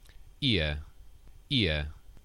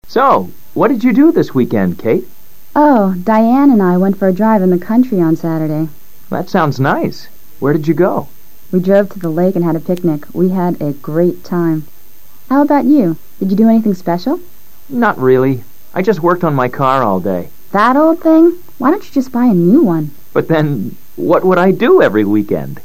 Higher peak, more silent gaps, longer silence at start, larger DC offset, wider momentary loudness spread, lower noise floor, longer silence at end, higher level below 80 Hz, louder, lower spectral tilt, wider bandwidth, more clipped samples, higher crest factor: second, -12 dBFS vs 0 dBFS; neither; first, 0.2 s vs 0 s; second, under 0.1% vs 5%; about the same, 12 LU vs 10 LU; first, -50 dBFS vs -44 dBFS; about the same, 0.05 s vs 0.05 s; first, -42 dBFS vs -52 dBFS; second, -29 LUFS vs -13 LUFS; second, -6 dB/octave vs -8.5 dB/octave; second, 12 kHz vs 16 kHz; neither; first, 20 dB vs 12 dB